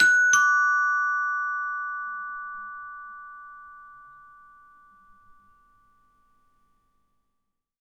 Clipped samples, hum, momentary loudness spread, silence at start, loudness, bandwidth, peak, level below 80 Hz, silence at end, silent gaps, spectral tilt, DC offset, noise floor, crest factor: under 0.1%; none; 26 LU; 0 s; -23 LUFS; 16.5 kHz; -6 dBFS; -70 dBFS; 3.85 s; none; 2 dB/octave; under 0.1%; -78 dBFS; 22 dB